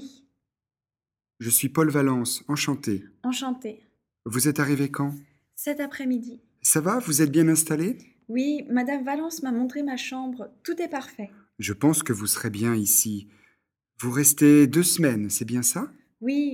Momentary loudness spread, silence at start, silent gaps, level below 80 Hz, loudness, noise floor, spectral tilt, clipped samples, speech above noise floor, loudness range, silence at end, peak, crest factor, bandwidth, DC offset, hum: 15 LU; 0 s; none; -68 dBFS; -23 LUFS; under -90 dBFS; -4 dB/octave; under 0.1%; over 66 dB; 7 LU; 0 s; -4 dBFS; 20 dB; 18 kHz; under 0.1%; none